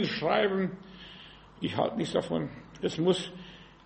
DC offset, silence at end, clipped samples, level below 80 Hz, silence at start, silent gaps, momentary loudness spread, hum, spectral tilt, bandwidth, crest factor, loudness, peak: under 0.1%; 0.2 s; under 0.1%; -60 dBFS; 0 s; none; 20 LU; none; -5.5 dB/octave; 8.4 kHz; 20 dB; -30 LUFS; -12 dBFS